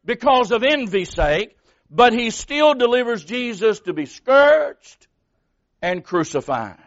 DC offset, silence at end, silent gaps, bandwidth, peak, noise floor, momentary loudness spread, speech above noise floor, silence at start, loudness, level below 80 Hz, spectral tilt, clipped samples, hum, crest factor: under 0.1%; 0.15 s; none; 8 kHz; -2 dBFS; -69 dBFS; 11 LU; 51 dB; 0.1 s; -18 LUFS; -40 dBFS; -2 dB/octave; under 0.1%; none; 18 dB